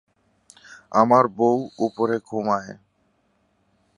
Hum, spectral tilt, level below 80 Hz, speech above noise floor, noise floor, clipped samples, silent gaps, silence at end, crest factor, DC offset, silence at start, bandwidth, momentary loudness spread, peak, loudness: none; -7 dB/octave; -68 dBFS; 46 dB; -67 dBFS; under 0.1%; none; 1.25 s; 22 dB; under 0.1%; 0.7 s; 11 kHz; 10 LU; -2 dBFS; -21 LUFS